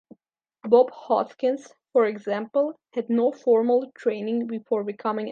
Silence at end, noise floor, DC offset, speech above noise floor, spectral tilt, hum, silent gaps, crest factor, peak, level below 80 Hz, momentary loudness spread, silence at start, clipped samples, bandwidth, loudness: 0 s; -73 dBFS; under 0.1%; 49 dB; -7 dB/octave; none; none; 20 dB; -4 dBFS; -82 dBFS; 9 LU; 0.65 s; under 0.1%; 7 kHz; -24 LUFS